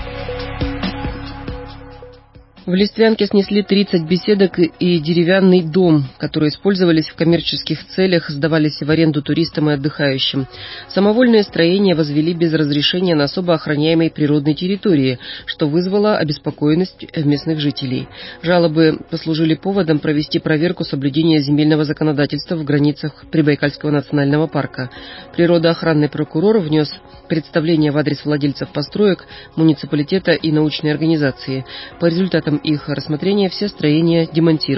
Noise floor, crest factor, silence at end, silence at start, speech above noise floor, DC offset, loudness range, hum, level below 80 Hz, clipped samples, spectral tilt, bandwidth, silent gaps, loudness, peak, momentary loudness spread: -43 dBFS; 14 dB; 0 s; 0 s; 28 dB; under 0.1%; 3 LU; none; -42 dBFS; under 0.1%; -10.5 dB/octave; 5.8 kHz; none; -16 LUFS; -2 dBFS; 10 LU